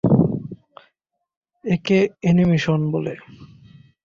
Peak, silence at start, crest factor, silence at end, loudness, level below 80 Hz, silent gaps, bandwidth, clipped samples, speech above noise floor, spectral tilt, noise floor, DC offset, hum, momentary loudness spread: -4 dBFS; 0.05 s; 18 dB; 0.6 s; -20 LUFS; -50 dBFS; 1.37-1.41 s; 7.2 kHz; under 0.1%; 54 dB; -8 dB/octave; -72 dBFS; under 0.1%; none; 19 LU